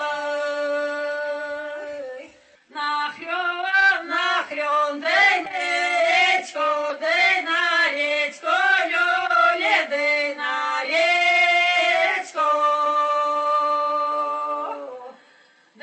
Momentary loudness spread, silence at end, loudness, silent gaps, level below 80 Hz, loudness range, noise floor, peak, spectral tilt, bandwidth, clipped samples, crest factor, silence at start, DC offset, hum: 12 LU; 0.7 s; -20 LUFS; none; -74 dBFS; 5 LU; -55 dBFS; -6 dBFS; 0 dB/octave; 8.8 kHz; under 0.1%; 14 dB; 0 s; under 0.1%; none